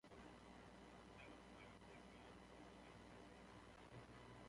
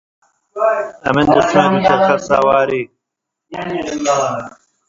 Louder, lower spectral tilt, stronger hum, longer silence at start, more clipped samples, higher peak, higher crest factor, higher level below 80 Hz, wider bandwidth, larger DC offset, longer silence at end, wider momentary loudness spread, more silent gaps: second, -62 LUFS vs -15 LUFS; about the same, -5 dB/octave vs -5 dB/octave; first, 60 Hz at -70 dBFS vs none; second, 0.05 s vs 0.55 s; neither; second, -48 dBFS vs 0 dBFS; about the same, 14 dB vs 16 dB; second, -72 dBFS vs -48 dBFS; first, 11 kHz vs 7.8 kHz; neither; second, 0 s vs 0.4 s; second, 1 LU vs 15 LU; neither